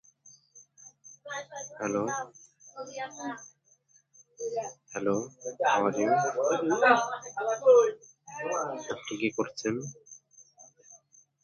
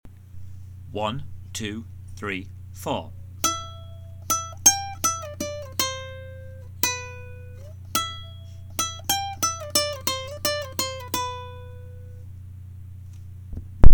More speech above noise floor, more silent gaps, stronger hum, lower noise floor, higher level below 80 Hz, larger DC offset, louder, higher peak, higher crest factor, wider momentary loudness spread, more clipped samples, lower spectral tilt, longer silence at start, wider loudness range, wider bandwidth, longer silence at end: first, 37 dB vs 10 dB; neither; neither; first, -65 dBFS vs -40 dBFS; second, -76 dBFS vs -30 dBFS; neither; second, -29 LUFS vs -26 LUFS; second, -8 dBFS vs 0 dBFS; about the same, 22 dB vs 22 dB; first, 22 LU vs 19 LU; neither; first, -4 dB/octave vs -2.5 dB/octave; first, 0.25 s vs 0.05 s; first, 12 LU vs 7 LU; second, 7.2 kHz vs 19 kHz; first, 0.5 s vs 0 s